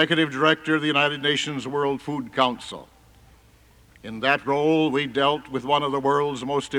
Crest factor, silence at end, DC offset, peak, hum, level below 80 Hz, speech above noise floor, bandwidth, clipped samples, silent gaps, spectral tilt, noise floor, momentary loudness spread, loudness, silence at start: 18 dB; 0 s; under 0.1%; -6 dBFS; none; -60 dBFS; 31 dB; 12.5 kHz; under 0.1%; none; -4.5 dB/octave; -54 dBFS; 9 LU; -23 LUFS; 0 s